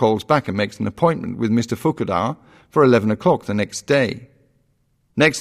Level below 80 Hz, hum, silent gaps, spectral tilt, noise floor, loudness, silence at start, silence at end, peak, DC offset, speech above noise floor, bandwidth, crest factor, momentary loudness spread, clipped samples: -54 dBFS; none; none; -6 dB/octave; -64 dBFS; -19 LUFS; 0 s; 0 s; -2 dBFS; under 0.1%; 45 dB; 15 kHz; 18 dB; 9 LU; under 0.1%